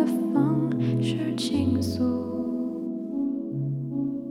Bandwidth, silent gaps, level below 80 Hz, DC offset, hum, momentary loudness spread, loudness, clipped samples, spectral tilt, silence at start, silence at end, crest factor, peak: 15 kHz; none; -58 dBFS; under 0.1%; none; 6 LU; -27 LUFS; under 0.1%; -7 dB/octave; 0 s; 0 s; 14 dB; -12 dBFS